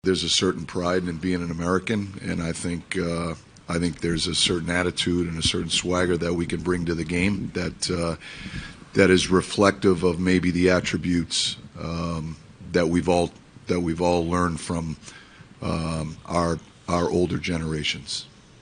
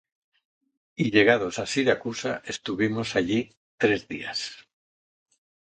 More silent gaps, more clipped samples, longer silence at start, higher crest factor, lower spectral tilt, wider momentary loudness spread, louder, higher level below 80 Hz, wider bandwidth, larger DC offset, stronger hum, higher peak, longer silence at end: second, none vs 3.57-3.78 s; neither; second, 0.05 s vs 1 s; about the same, 24 dB vs 24 dB; about the same, -4.5 dB/octave vs -4.5 dB/octave; about the same, 12 LU vs 12 LU; about the same, -24 LUFS vs -25 LUFS; first, -44 dBFS vs -60 dBFS; first, 10.5 kHz vs 9.4 kHz; neither; neither; about the same, -2 dBFS vs -4 dBFS; second, 0.35 s vs 1 s